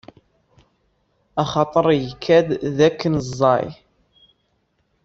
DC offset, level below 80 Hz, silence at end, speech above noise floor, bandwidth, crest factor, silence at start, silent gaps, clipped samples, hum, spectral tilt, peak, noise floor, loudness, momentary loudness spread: under 0.1%; -52 dBFS; 1.3 s; 49 dB; 7.8 kHz; 18 dB; 1.35 s; none; under 0.1%; none; -6.5 dB/octave; -2 dBFS; -67 dBFS; -19 LUFS; 7 LU